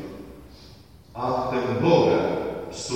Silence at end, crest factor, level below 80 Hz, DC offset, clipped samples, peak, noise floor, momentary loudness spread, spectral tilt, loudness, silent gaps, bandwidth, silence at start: 0 s; 20 dB; -52 dBFS; 0.1%; under 0.1%; -4 dBFS; -48 dBFS; 23 LU; -6 dB/octave; -23 LUFS; none; 15.5 kHz; 0 s